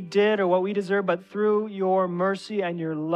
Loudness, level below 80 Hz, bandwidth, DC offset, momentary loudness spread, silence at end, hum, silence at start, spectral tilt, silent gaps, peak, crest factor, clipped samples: -24 LUFS; -78 dBFS; 9.6 kHz; under 0.1%; 6 LU; 0 s; none; 0 s; -7 dB/octave; none; -10 dBFS; 14 dB; under 0.1%